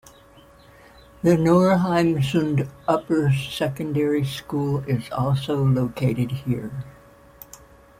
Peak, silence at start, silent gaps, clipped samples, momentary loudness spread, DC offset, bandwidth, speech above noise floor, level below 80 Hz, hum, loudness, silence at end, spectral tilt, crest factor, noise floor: -4 dBFS; 1.25 s; none; under 0.1%; 11 LU; under 0.1%; 16 kHz; 29 dB; -50 dBFS; none; -22 LUFS; 1.1 s; -7.5 dB/octave; 18 dB; -50 dBFS